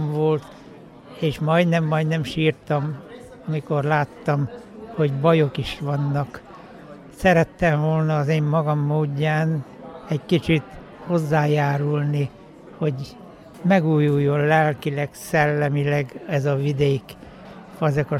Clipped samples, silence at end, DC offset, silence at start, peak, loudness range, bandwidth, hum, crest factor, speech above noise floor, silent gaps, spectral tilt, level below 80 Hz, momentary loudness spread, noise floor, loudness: under 0.1%; 0 s; under 0.1%; 0 s; -4 dBFS; 3 LU; 13.5 kHz; none; 18 dB; 23 dB; none; -7.5 dB/octave; -50 dBFS; 20 LU; -43 dBFS; -22 LUFS